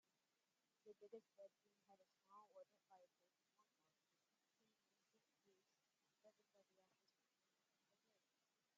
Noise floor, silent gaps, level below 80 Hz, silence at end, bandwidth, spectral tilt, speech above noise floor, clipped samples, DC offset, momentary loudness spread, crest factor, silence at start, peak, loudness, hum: under -90 dBFS; none; under -90 dBFS; 0 s; 7.2 kHz; -3 dB/octave; over 21 dB; under 0.1%; under 0.1%; 5 LU; 24 dB; 0.05 s; -50 dBFS; -67 LUFS; none